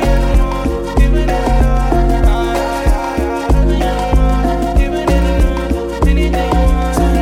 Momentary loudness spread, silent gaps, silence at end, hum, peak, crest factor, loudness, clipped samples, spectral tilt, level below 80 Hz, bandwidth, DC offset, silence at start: 3 LU; none; 0 s; none; -2 dBFS; 10 dB; -15 LUFS; under 0.1%; -7 dB/octave; -14 dBFS; 14.5 kHz; under 0.1%; 0 s